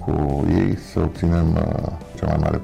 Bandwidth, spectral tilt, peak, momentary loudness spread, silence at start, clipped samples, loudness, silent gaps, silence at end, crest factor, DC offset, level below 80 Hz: 10 kHz; -9 dB/octave; -8 dBFS; 7 LU; 0 s; under 0.1%; -21 LUFS; none; 0 s; 12 dB; under 0.1%; -32 dBFS